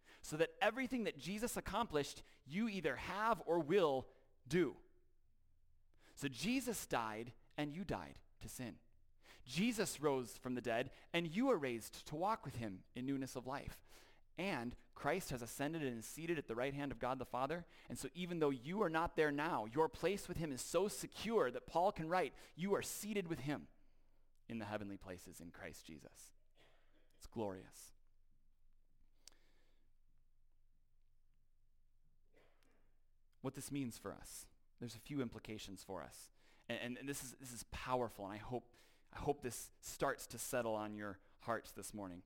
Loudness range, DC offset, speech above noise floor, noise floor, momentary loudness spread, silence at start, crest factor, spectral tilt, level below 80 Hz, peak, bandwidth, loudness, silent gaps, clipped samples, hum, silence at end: 13 LU; under 0.1%; 28 dB; -70 dBFS; 15 LU; 0.05 s; 20 dB; -4.5 dB/octave; -64 dBFS; -24 dBFS; 17 kHz; -43 LUFS; none; under 0.1%; none; 0.05 s